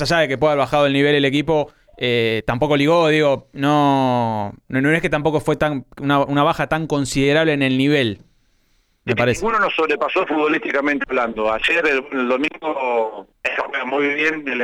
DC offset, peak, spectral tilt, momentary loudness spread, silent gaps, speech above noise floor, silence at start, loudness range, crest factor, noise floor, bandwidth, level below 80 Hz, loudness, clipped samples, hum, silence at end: under 0.1%; -6 dBFS; -5.5 dB/octave; 7 LU; none; 43 dB; 0 s; 2 LU; 12 dB; -61 dBFS; 13.5 kHz; -46 dBFS; -18 LUFS; under 0.1%; none; 0 s